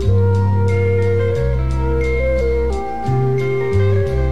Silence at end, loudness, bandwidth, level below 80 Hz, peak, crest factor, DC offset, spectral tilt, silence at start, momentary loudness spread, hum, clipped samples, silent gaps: 0 s; -17 LUFS; 7.8 kHz; -24 dBFS; -4 dBFS; 10 dB; 4%; -8.5 dB/octave; 0 s; 4 LU; none; under 0.1%; none